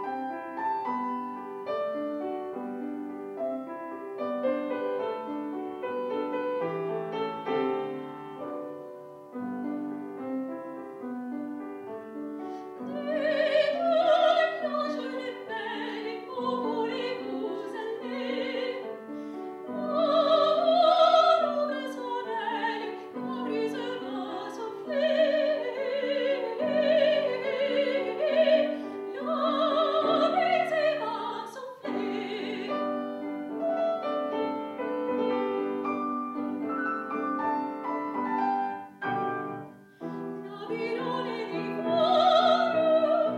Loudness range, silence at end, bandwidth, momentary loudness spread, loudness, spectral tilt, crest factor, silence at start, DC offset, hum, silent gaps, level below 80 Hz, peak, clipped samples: 9 LU; 0 s; 10 kHz; 14 LU; -29 LUFS; -5.5 dB/octave; 18 dB; 0 s; under 0.1%; none; none; -82 dBFS; -10 dBFS; under 0.1%